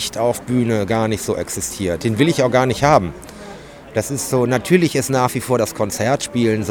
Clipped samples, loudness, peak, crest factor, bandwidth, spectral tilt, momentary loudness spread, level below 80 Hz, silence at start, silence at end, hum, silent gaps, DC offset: under 0.1%; -18 LUFS; 0 dBFS; 18 dB; over 20 kHz; -5 dB/octave; 10 LU; -44 dBFS; 0 s; 0 s; none; none; under 0.1%